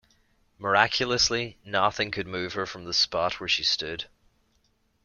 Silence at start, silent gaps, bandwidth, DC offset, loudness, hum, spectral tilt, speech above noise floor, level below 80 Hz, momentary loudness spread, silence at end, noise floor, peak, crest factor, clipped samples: 0.6 s; none; 12 kHz; under 0.1%; -25 LUFS; none; -2 dB/octave; 42 dB; -56 dBFS; 11 LU; 1 s; -69 dBFS; -4 dBFS; 24 dB; under 0.1%